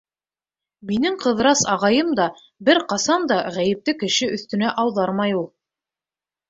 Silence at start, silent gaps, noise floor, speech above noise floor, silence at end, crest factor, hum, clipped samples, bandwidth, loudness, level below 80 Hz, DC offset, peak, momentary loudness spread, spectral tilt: 0.85 s; none; under -90 dBFS; over 70 dB; 1.05 s; 20 dB; none; under 0.1%; 8 kHz; -20 LUFS; -60 dBFS; under 0.1%; -2 dBFS; 7 LU; -3.5 dB/octave